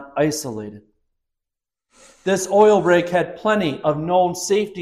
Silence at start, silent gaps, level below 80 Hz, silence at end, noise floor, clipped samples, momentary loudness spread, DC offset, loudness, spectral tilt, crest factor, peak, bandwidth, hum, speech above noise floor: 0 s; none; -56 dBFS; 0 s; -86 dBFS; under 0.1%; 14 LU; under 0.1%; -18 LUFS; -4.5 dB/octave; 16 dB; -4 dBFS; 15 kHz; none; 68 dB